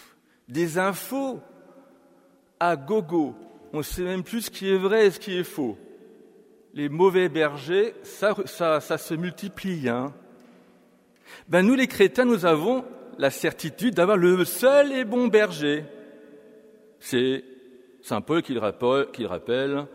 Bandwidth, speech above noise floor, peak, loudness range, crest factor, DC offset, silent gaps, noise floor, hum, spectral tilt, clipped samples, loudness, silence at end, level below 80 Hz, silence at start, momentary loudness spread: 16 kHz; 35 dB; -6 dBFS; 7 LU; 18 dB; under 0.1%; none; -59 dBFS; none; -5.5 dB/octave; under 0.1%; -24 LUFS; 0.05 s; -58 dBFS; 0.5 s; 13 LU